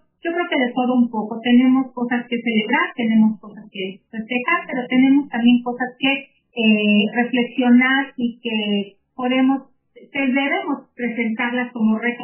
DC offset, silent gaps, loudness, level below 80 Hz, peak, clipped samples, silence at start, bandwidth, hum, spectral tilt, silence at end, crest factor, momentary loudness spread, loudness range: under 0.1%; none; -19 LUFS; -74 dBFS; -4 dBFS; under 0.1%; 0.25 s; 3.2 kHz; none; -9 dB/octave; 0 s; 16 dB; 11 LU; 4 LU